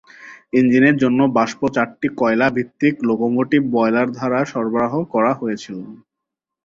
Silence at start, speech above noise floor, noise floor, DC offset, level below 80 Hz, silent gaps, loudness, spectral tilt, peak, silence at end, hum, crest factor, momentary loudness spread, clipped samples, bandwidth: 0.2 s; 65 dB; -83 dBFS; under 0.1%; -58 dBFS; none; -18 LUFS; -7 dB/octave; -2 dBFS; 0.7 s; none; 16 dB; 9 LU; under 0.1%; 7.6 kHz